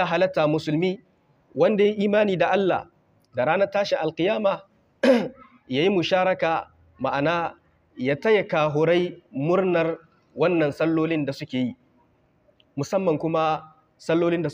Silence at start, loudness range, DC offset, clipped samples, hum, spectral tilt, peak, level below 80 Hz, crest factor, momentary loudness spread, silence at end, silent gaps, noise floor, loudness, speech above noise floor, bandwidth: 0 s; 3 LU; under 0.1%; under 0.1%; none; -6.5 dB/octave; -6 dBFS; -66 dBFS; 16 dB; 10 LU; 0 s; none; -62 dBFS; -23 LUFS; 40 dB; 11 kHz